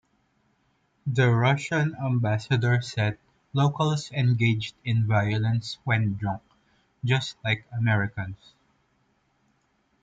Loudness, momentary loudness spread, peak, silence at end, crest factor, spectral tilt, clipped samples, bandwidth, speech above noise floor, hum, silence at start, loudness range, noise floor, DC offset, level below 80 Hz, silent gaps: -26 LUFS; 10 LU; -10 dBFS; 1.7 s; 16 dB; -6.5 dB/octave; under 0.1%; 7.8 kHz; 45 dB; none; 1.05 s; 5 LU; -69 dBFS; under 0.1%; -60 dBFS; none